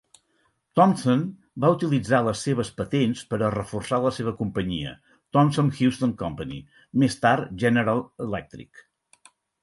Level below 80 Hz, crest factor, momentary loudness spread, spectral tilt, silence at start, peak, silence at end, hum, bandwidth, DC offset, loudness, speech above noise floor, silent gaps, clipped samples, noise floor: -52 dBFS; 20 dB; 11 LU; -6.5 dB/octave; 0.75 s; -4 dBFS; 1 s; none; 11.5 kHz; under 0.1%; -24 LUFS; 46 dB; none; under 0.1%; -69 dBFS